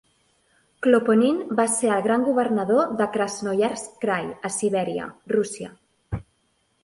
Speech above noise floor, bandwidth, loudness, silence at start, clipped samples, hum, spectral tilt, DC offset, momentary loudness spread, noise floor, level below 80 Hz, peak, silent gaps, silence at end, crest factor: 46 dB; 11.5 kHz; -23 LUFS; 0.8 s; under 0.1%; none; -4.5 dB/octave; under 0.1%; 14 LU; -68 dBFS; -54 dBFS; -4 dBFS; none; 0.6 s; 20 dB